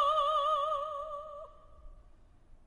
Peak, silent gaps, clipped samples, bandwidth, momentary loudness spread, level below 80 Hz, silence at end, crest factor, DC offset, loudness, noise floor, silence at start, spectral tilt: -18 dBFS; none; under 0.1%; 9.6 kHz; 20 LU; -58 dBFS; 0.1 s; 16 dB; under 0.1%; -32 LUFS; -58 dBFS; 0 s; -2.5 dB/octave